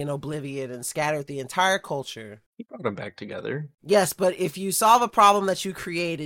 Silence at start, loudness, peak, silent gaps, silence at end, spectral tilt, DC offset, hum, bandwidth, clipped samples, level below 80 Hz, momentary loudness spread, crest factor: 0 s; -24 LUFS; -6 dBFS; 2.46-2.53 s; 0 s; -3.5 dB/octave; under 0.1%; none; 17 kHz; under 0.1%; -62 dBFS; 17 LU; 20 dB